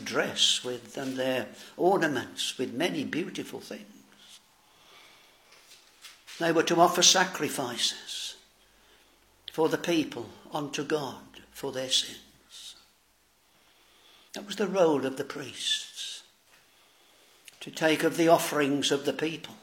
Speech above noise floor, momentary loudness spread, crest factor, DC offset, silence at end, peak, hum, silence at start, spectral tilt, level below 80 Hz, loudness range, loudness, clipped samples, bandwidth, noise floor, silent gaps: 38 dB; 21 LU; 24 dB; under 0.1%; 0.05 s; -6 dBFS; none; 0 s; -2.5 dB/octave; -74 dBFS; 9 LU; -27 LUFS; under 0.1%; 16.5 kHz; -66 dBFS; none